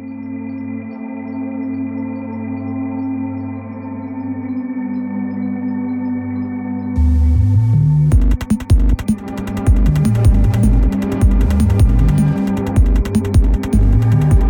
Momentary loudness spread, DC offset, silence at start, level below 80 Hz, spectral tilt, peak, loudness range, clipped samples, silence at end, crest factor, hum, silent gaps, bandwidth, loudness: 12 LU; under 0.1%; 0 s; -18 dBFS; -8.5 dB/octave; -2 dBFS; 9 LU; under 0.1%; 0 s; 14 dB; none; none; 19 kHz; -17 LUFS